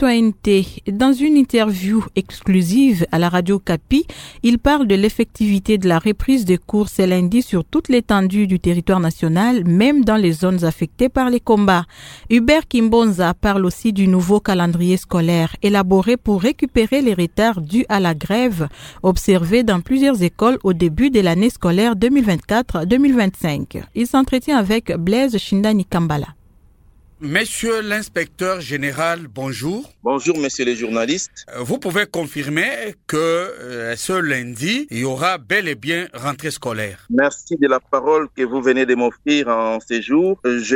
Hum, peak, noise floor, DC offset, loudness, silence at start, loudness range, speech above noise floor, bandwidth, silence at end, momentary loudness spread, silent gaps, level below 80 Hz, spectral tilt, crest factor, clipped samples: none; 0 dBFS; -49 dBFS; under 0.1%; -17 LUFS; 0 s; 5 LU; 33 dB; 17.5 kHz; 0 s; 9 LU; none; -38 dBFS; -6 dB/octave; 16 dB; under 0.1%